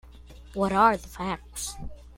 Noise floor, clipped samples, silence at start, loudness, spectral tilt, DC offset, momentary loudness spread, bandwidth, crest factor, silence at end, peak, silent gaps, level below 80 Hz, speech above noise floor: -47 dBFS; under 0.1%; 0.05 s; -26 LUFS; -4.5 dB/octave; under 0.1%; 16 LU; 16.5 kHz; 20 dB; 0 s; -8 dBFS; none; -46 dBFS; 21 dB